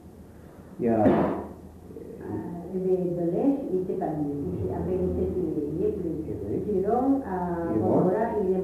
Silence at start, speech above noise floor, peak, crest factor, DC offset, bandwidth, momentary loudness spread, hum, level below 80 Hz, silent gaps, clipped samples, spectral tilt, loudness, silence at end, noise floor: 0 s; 21 dB; -8 dBFS; 20 dB; under 0.1%; 13.5 kHz; 13 LU; none; -48 dBFS; none; under 0.1%; -10 dB/octave; -27 LUFS; 0 s; -47 dBFS